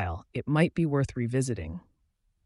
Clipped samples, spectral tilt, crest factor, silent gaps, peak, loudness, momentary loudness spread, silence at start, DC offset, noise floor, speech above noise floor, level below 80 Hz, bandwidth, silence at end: under 0.1%; -7 dB/octave; 20 dB; none; -10 dBFS; -29 LUFS; 12 LU; 0 s; under 0.1%; -73 dBFS; 45 dB; -50 dBFS; 11.5 kHz; 0.65 s